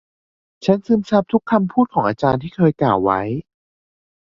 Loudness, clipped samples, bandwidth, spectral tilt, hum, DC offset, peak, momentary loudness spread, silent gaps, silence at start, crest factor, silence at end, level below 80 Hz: -18 LUFS; under 0.1%; 7.2 kHz; -8.5 dB/octave; none; under 0.1%; -2 dBFS; 5 LU; none; 0.6 s; 18 dB; 0.95 s; -50 dBFS